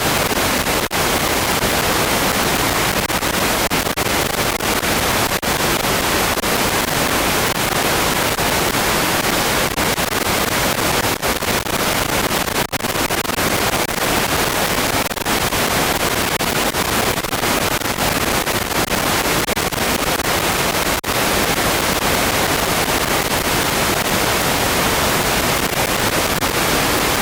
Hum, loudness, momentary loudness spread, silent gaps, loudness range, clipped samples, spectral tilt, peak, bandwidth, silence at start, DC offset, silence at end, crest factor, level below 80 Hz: none; -16 LUFS; 2 LU; none; 1 LU; under 0.1%; -2.5 dB/octave; -2 dBFS; 19 kHz; 0 s; under 0.1%; 0 s; 16 dB; -34 dBFS